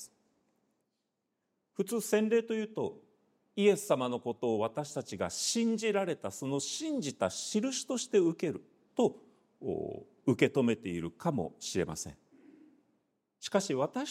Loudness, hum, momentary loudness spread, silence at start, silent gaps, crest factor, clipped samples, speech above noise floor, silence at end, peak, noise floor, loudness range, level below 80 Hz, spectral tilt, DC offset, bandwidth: -33 LUFS; none; 11 LU; 0 s; none; 24 dB; under 0.1%; 51 dB; 0 s; -10 dBFS; -84 dBFS; 4 LU; -70 dBFS; -4.5 dB/octave; under 0.1%; 16 kHz